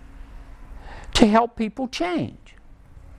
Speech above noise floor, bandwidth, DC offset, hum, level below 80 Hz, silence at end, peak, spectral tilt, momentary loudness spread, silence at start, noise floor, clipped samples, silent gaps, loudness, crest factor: 26 dB; 13 kHz; under 0.1%; none; -40 dBFS; 0 s; 0 dBFS; -5 dB/octave; 20 LU; 0.15 s; -47 dBFS; under 0.1%; none; -22 LUFS; 24 dB